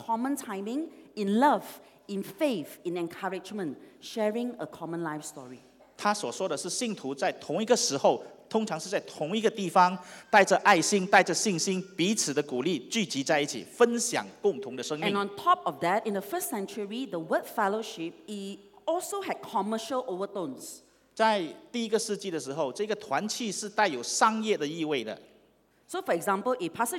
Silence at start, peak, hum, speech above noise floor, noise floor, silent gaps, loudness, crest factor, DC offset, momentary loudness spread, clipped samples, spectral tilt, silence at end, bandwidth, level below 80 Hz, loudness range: 0 s; -6 dBFS; none; 36 dB; -65 dBFS; none; -29 LUFS; 22 dB; under 0.1%; 14 LU; under 0.1%; -3.5 dB/octave; 0 s; 18 kHz; -78 dBFS; 9 LU